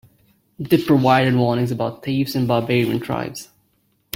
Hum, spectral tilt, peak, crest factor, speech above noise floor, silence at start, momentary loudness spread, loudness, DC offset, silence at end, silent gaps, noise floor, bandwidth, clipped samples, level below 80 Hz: none; -6.5 dB/octave; -2 dBFS; 18 dB; 46 dB; 0.6 s; 11 LU; -19 LUFS; under 0.1%; 0.7 s; none; -64 dBFS; 16.5 kHz; under 0.1%; -54 dBFS